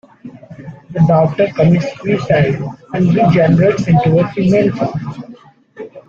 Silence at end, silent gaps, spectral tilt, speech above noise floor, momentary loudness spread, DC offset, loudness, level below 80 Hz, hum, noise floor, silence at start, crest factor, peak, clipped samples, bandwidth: 0.1 s; none; -8.5 dB/octave; 27 dB; 22 LU; under 0.1%; -13 LUFS; -44 dBFS; none; -39 dBFS; 0.25 s; 12 dB; -2 dBFS; under 0.1%; 7.2 kHz